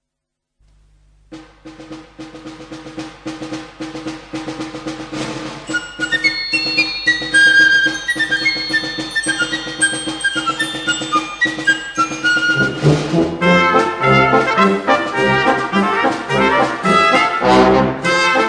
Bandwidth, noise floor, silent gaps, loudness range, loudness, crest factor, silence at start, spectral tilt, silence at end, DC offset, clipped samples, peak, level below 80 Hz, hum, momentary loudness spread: 10.5 kHz; -78 dBFS; none; 16 LU; -14 LUFS; 16 dB; 1.3 s; -4 dB/octave; 0 s; under 0.1%; under 0.1%; 0 dBFS; -44 dBFS; none; 18 LU